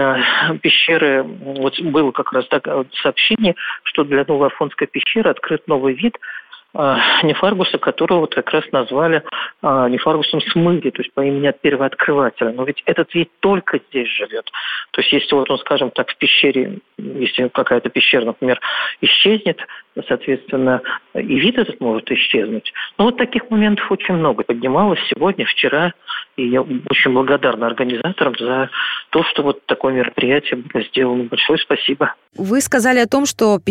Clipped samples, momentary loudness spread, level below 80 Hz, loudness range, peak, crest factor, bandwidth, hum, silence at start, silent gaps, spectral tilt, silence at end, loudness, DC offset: under 0.1%; 8 LU; -56 dBFS; 2 LU; -2 dBFS; 14 dB; 15 kHz; none; 0 s; none; -4.5 dB/octave; 0 s; -16 LUFS; under 0.1%